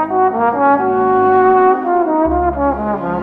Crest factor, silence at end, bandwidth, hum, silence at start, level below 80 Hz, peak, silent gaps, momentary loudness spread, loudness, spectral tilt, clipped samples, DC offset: 10 dB; 0 s; 3.9 kHz; none; 0 s; -34 dBFS; -2 dBFS; none; 6 LU; -13 LUFS; -10 dB/octave; under 0.1%; under 0.1%